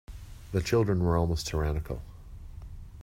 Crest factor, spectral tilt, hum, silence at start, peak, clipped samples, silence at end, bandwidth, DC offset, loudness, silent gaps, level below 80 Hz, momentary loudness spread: 18 dB; -6.5 dB/octave; none; 0.1 s; -12 dBFS; under 0.1%; 0 s; 16 kHz; under 0.1%; -29 LUFS; none; -40 dBFS; 21 LU